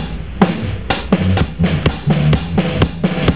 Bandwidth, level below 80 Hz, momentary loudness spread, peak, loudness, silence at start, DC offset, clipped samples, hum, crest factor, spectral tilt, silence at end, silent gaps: 4 kHz; -26 dBFS; 5 LU; 0 dBFS; -16 LUFS; 0 s; 2%; 0.1%; none; 16 dB; -11.5 dB/octave; 0 s; none